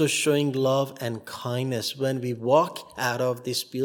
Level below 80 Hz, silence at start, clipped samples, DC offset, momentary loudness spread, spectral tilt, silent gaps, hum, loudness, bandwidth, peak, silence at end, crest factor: -72 dBFS; 0 s; under 0.1%; under 0.1%; 9 LU; -4.5 dB/octave; none; none; -26 LUFS; 18 kHz; -8 dBFS; 0 s; 18 dB